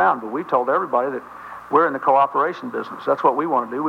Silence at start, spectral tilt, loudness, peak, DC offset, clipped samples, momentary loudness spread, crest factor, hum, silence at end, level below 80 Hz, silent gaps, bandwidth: 0 s; -7 dB/octave; -20 LUFS; -4 dBFS; under 0.1%; under 0.1%; 12 LU; 16 dB; none; 0 s; -66 dBFS; none; 9.6 kHz